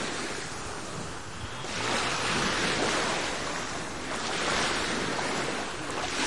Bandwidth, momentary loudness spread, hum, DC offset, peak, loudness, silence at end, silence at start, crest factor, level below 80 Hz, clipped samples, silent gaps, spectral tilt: 11.5 kHz; 10 LU; none; 0.7%; -14 dBFS; -30 LUFS; 0 s; 0 s; 16 dB; -52 dBFS; under 0.1%; none; -2.5 dB/octave